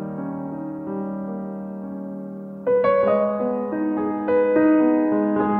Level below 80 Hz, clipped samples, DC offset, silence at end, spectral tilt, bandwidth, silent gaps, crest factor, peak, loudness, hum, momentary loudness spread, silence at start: -60 dBFS; under 0.1%; under 0.1%; 0 s; -10.5 dB/octave; 4.2 kHz; none; 16 dB; -6 dBFS; -22 LUFS; none; 15 LU; 0 s